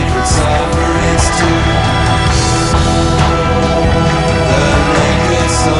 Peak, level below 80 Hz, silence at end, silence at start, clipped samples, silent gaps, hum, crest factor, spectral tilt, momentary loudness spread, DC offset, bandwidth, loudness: 0 dBFS; -18 dBFS; 0 s; 0 s; under 0.1%; none; none; 10 dB; -5 dB/octave; 2 LU; under 0.1%; 11.5 kHz; -11 LUFS